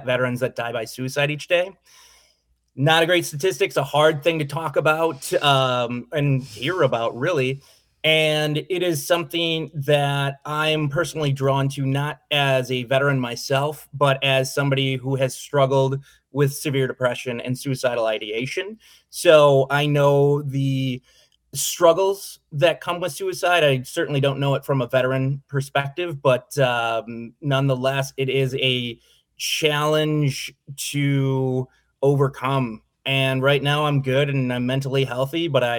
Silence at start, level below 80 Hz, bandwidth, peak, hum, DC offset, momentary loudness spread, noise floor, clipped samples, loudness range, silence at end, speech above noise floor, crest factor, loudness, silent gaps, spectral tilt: 0 s; -60 dBFS; 19.5 kHz; -2 dBFS; none; under 0.1%; 9 LU; -64 dBFS; under 0.1%; 3 LU; 0 s; 43 dB; 20 dB; -21 LUFS; none; -5 dB/octave